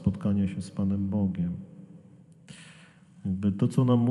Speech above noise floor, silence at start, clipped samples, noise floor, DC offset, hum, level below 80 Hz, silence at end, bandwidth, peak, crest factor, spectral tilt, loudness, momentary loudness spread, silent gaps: 27 dB; 0 s; under 0.1%; -54 dBFS; under 0.1%; none; -56 dBFS; 0 s; 10.5 kHz; -12 dBFS; 16 dB; -9 dB/octave; -28 LUFS; 23 LU; none